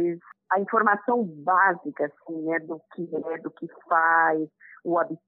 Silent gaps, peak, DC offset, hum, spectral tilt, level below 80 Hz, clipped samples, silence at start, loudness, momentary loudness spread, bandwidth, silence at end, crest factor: none; -6 dBFS; under 0.1%; none; -11 dB/octave; -84 dBFS; under 0.1%; 0 s; -25 LUFS; 16 LU; 3.9 kHz; 0.1 s; 20 dB